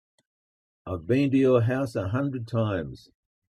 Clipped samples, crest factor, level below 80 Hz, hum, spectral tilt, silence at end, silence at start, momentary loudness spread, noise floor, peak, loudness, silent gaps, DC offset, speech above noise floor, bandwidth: under 0.1%; 18 dB; -58 dBFS; none; -8.5 dB/octave; 0.55 s; 0.85 s; 15 LU; under -90 dBFS; -8 dBFS; -25 LUFS; none; under 0.1%; over 65 dB; 12 kHz